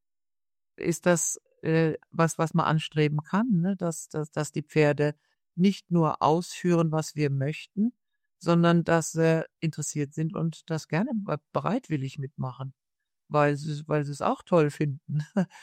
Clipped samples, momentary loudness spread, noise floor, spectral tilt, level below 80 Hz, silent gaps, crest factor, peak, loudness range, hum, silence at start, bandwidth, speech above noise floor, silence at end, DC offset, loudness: under 0.1%; 9 LU; under -90 dBFS; -6 dB/octave; -66 dBFS; none; 20 dB; -8 dBFS; 4 LU; none; 0.8 s; 14.5 kHz; over 64 dB; 0 s; under 0.1%; -27 LUFS